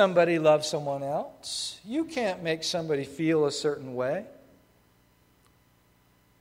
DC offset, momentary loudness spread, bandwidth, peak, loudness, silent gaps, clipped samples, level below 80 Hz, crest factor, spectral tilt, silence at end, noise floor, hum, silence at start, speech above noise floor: under 0.1%; 11 LU; 16 kHz; -8 dBFS; -28 LUFS; none; under 0.1%; -68 dBFS; 20 dB; -4.5 dB/octave; 2.1 s; -64 dBFS; none; 0 s; 37 dB